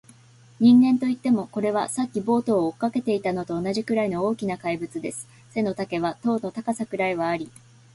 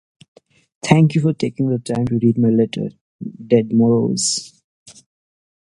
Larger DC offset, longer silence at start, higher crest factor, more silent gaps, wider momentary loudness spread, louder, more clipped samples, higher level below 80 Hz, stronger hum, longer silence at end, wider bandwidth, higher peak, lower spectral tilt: neither; second, 0.6 s vs 0.85 s; about the same, 16 dB vs 18 dB; second, none vs 3.01-3.19 s, 4.64-4.86 s; second, 10 LU vs 15 LU; second, -24 LUFS vs -17 LUFS; neither; second, -62 dBFS vs -54 dBFS; neither; second, 0.45 s vs 0.75 s; about the same, 11.5 kHz vs 11.5 kHz; second, -8 dBFS vs 0 dBFS; about the same, -6 dB/octave vs -6 dB/octave